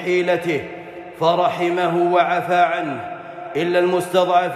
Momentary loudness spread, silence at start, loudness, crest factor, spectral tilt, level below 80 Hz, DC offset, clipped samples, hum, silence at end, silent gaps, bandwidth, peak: 15 LU; 0 s; -19 LUFS; 14 dB; -5.5 dB/octave; -66 dBFS; under 0.1%; under 0.1%; none; 0 s; none; 13.5 kHz; -4 dBFS